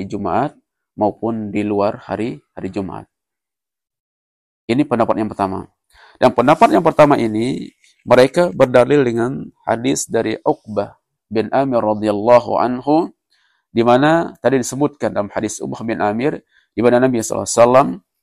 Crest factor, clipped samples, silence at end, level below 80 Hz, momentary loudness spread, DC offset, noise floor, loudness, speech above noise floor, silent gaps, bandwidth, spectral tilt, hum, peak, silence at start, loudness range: 16 dB; under 0.1%; 0.25 s; -52 dBFS; 13 LU; under 0.1%; -87 dBFS; -16 LUFS; 72 dB; 4.00-4.68 s; 13 kHz; -5.5 dB/octave; none; 0 dBFS; 0 s; 9 LU